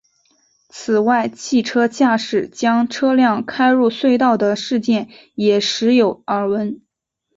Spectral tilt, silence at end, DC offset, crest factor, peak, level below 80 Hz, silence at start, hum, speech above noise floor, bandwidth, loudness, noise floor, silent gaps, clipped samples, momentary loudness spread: -4.5 dB/octave; 0.6 s; under 0.1%; 14 dB; -2 dBFS; -62 dBFS; 0.75 s; none; 58 dB; 7.8 kHz; -17 LUFS; -74 dBFS; none; under 0.1%; 7 LU